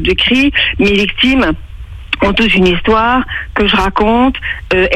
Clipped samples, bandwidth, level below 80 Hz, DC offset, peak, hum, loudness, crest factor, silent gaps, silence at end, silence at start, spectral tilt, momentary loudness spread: under 0.1%; 12 kHz; -26 dBFS; under 0.1%; 0 dBFS; none; -11 LUFS; 12 dB; none; 0 s; 0 s; -5.5 dB/octave; 10 LU